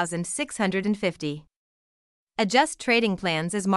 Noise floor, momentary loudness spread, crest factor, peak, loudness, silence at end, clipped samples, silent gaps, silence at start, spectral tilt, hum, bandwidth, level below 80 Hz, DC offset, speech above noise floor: under -90 dBFS; 11 LU; 20 dB; -6 dBFS; -25 LUFS; 0 s; under 0.1%; 1.56-2.27 s; 0 s; -4 dB/octave; none; 12 kHz; -60 dBFS; under 0.1%; over 65 dB